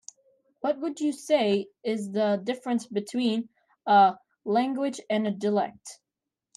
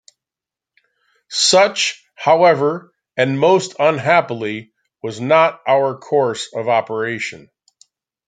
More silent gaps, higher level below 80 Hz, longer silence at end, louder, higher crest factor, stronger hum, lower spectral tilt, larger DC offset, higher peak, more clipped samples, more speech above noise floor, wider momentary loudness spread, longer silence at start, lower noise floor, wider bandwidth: neither; second, -78 dBFS vs -66 dBFS; second, 0.65 s vs 0.9 s; second, -27 LUFS vs -16 LUFS; about the same, 18 dB vs 16 dB; neither; first, -5.5 dB/octave vs -3.5 dB/octave; neither; second, -8 dBFS vs 0 dBFS; neither; second, 62 dB vs 72 dB; about the same, 12 LU vs 14 LU; second, 0.65 s vs 1.3 s; about the same, -88 dBFS vs -88 dBFS; first, 12.5 kHz vs 9.6 kHz